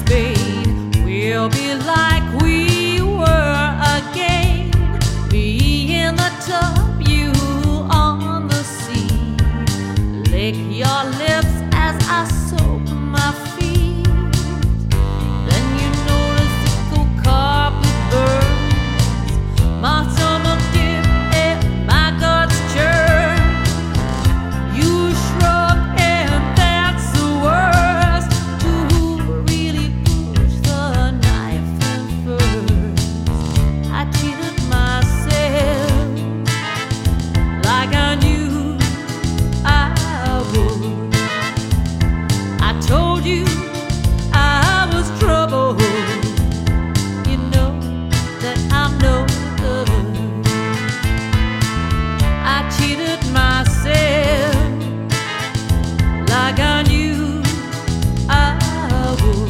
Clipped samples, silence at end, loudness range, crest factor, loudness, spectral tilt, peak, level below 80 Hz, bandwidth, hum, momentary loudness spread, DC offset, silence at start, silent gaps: under 0.1%; 0 s; 3 LU; 16 dB; -17 LUFS; -5.5 dB/octave; 0 dBFS; -22 dBFS; 16.5 kHz; none; 5 LU; under 0.1%; 0 s; none